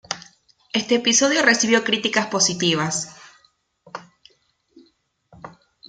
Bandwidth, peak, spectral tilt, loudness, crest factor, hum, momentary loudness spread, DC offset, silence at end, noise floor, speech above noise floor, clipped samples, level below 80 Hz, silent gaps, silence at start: 10.5 kHz; -2 dBFS; -2 dB/octave; -18 LUFS; 22 dB; none; 22 LU; under 0.1%; 0.4 s; -63 dBFS; 44 dB; under 0.1%; -66 dBFS; none; 0.1 s